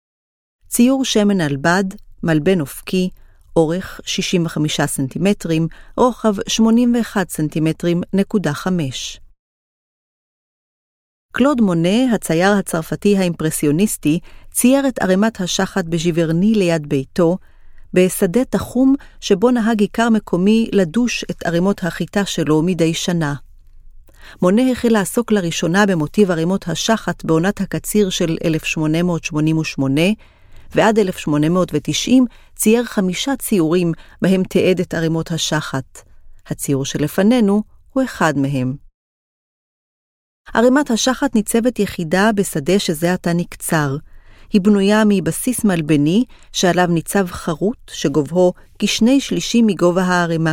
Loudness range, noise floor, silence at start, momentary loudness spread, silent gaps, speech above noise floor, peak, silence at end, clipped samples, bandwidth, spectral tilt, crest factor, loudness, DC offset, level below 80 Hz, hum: 3 LU; -40 dBFS; 0.7 s; 7 LU; 9.39-11.29 s, 38.94-40.45 s; 24 dB; 0 dBFS; 0 s; under 0.1%; 16.5 kHz; -5 dB/octave; 16 dB; -17 LUFS; under 0.1%; -42 dBFS; none